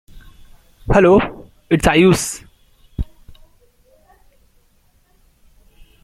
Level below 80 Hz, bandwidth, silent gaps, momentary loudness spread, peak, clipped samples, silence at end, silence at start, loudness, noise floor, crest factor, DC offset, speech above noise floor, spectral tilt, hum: -34 dBFS; 15.5 kHz; none; 21 LU; -2 dBFS; under 0.1%; 3 s; 0.15 s; -14 LUFS; -56 dBFS; 18 dB; under 0.1%; 44 dB; -5.5 dB/octave; none